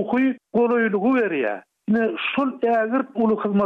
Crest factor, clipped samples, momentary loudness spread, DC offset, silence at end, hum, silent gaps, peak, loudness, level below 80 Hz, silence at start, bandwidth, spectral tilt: 10 dB; under 0.1%; 4 LU; under 0.1%; 0 s; none; none; -10 dBFS; -21 LUFS; -66 dBFS; 0 s; 4.5 kHz; -8.5 dB/octave